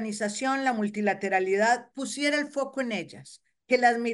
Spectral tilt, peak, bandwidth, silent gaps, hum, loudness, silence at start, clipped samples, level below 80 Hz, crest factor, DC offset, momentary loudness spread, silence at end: -3.5 dB/octave; -10 dBFS; 11.5 kHz; none; none; -27 LUFS; 0 s; under 0.1%; -78 dBFS; 18 dB; under 0.1%; 10 LU; 0 s